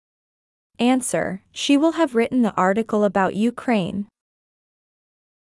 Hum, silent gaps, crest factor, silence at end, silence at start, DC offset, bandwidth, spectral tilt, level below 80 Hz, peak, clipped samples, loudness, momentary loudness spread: none; none; 16 dB; 1.5 s; 0.8 s; under 0.1%; 12 kHz; -5 dB/octave; -60 dBFS; -6 dBFS; under 0.1%; -20 LUFS; 9 LU